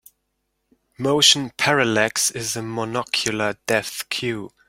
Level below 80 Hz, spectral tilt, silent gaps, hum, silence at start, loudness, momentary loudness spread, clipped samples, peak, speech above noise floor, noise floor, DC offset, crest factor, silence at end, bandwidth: -60 dBFS; -2.5 dB/octave; none; none; 1 s; -20 LUFS; 12 LU; under 0.1%; 0 dBFS; 53 dB; -74 dBFS; under 0.1%; 22 dB; 0.2 s; 16.5 kHz